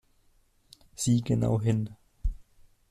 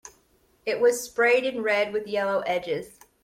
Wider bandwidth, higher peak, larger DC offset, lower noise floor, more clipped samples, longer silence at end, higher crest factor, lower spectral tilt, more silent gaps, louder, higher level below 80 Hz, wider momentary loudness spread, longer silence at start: second, 13.5 kHz vs 16 kHz; second, -14 dBFS vs -10 dBFS; neither; about the same, -65 dBFS vs -64 dBFS; neither; first, 0.5 s vs 0.35 s; about the same, 18 dB vs 16 dB; first, -6.5 dB/octave vs -3 dB/octave; neither; second, -29 LUFS vs -25 LUFS; first, -40 dBFS vs -66 dBFS; about the same, 13 LU vs 11 LU; first, 1 s vs 0.05 s